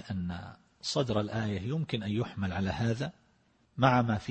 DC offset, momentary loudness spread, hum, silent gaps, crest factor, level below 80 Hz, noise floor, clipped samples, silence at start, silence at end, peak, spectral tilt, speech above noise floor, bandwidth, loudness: under 0.1%; 13 LU; none; none; 22 dB; -56 dBFS; -68 dBFS; under 0.1%; 0 s; 0 s; -10 dBFS; -6 dB/octave; 37 dB; 8.8 kHz; -32 LUFS